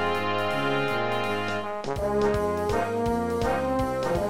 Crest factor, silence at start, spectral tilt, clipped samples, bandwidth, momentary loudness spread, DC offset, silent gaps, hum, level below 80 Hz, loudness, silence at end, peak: 12 dB; 0 s; -5.5 dB/octave; under 0.1%; 16.5 kHz; 4 LU; under 0.1%; none; none; -42 dBFS; -26 LUFS; 0 s; -14 dBFS